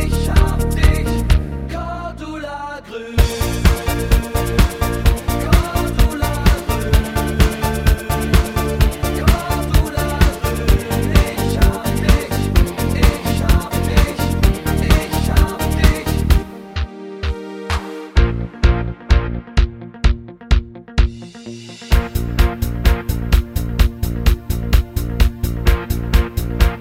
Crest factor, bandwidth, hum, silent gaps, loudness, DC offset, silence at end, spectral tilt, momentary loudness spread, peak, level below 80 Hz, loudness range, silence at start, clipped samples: 16 dB; 16.5 kHz; none; none; -18 LUFS; under 0.1%; 0 s; -5.5 dB/octave; 9 LU; 0 dBFS; -18 dBFS; 3 LU; 0 s; under 0.1%